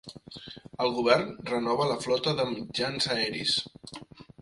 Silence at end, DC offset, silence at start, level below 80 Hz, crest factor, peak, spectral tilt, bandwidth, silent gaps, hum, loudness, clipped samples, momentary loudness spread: 0 s; under 0.1%; 0.05 s; -62 dBFS; 22 dB; -8 dBFS; -4 dB/octave; 11.5 kHz; none; none; -28 LUFS; under 0.1%; 19 LU